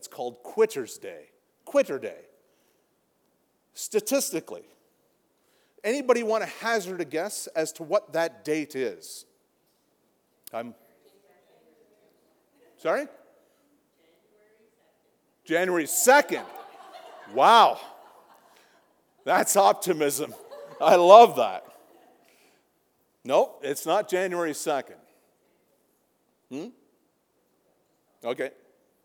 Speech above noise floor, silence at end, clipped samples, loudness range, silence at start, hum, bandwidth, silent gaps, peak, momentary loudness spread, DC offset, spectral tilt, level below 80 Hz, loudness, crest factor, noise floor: 47 dB; 0.55 s; under 0.1%; 17 LU; 0.05 s; none; over 20 kHz; none; 0 dBFS; 24 LU; under 0.1%; -2.5 dB/octave; -90 dBFS; -23 LUFS; 26 dB; -70 dBFS